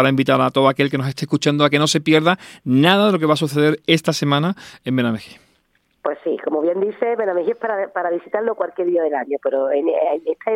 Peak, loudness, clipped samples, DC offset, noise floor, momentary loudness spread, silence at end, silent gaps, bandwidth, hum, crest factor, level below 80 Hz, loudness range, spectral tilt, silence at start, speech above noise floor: 0 dBFS; -18 LUFS; under 0.1%; under 0.1%; -63 dBFS; 8 LU; 0 s; none; 16 kHz; none; 18 dB; -66 dBFS; 6 LU; -5.5 dB/octave; 0 s; 45 dB